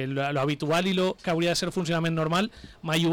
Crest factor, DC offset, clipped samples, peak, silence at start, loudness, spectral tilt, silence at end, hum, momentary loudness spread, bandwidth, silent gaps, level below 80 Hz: 8 dB; under 0.1%; under 0.1%; -18 dBFS; 0 s; -26 LUFS; -5 dB/octave; 0 s; none; 3 LU; 18.5 kHz; none; -54 dBFS